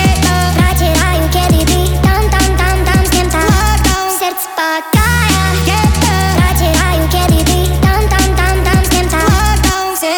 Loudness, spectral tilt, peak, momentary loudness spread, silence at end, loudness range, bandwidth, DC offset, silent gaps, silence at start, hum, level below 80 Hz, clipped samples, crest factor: -11 LUFS; -4.5 dB/octave; -2 dBFS; 2 LU; 0 s; 1 LU; over 20 kHz; under 0.1%; none; 0 s; none; -16 dBFS; under 0.1%; 10 dB